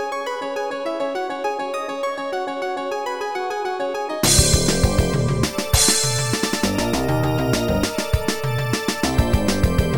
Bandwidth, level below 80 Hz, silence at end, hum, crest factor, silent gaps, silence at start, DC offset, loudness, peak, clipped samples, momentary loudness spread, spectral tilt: over 20 kHz; -30 dBFS; 0 s; none; 20 dB; none; 0 s; under 0.1%; -20 LUFS; 0 dBFS; under 0.1%; 10 LU; -4 dB/octave